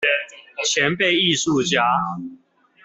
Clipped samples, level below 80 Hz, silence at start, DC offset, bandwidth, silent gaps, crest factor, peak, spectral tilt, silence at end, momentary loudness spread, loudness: under 0.1%; -62 dBFS; 0 s; under 0.1%; 8.4 kHz; none; 18 dB; -4 dBFS; -3 dB/octave; 0.5 s; 15 LU; -19 LUFS